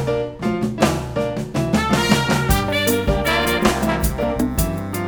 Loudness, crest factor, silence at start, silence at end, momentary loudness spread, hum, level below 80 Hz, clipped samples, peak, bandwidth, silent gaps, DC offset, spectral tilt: -19 LUFS; 18 dB; 0 s; 0 s; 6 LU; none; -30 dBFS; under 0.1%; 0 dBFS; over 20 kHz; none; under 0.1%; -5 dB/octave